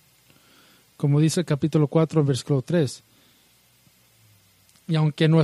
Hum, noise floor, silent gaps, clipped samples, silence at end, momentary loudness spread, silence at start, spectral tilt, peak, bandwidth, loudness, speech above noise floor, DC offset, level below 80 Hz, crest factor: none; -59 dBFS; none; under 0.1%; 0 s; 8 LU; 1 s; -7 dB/octave; -6 dBFS; 12.5 kHz; -22 LUFS; 39 dB; under 0.1%; -64 dBFS; 18 dB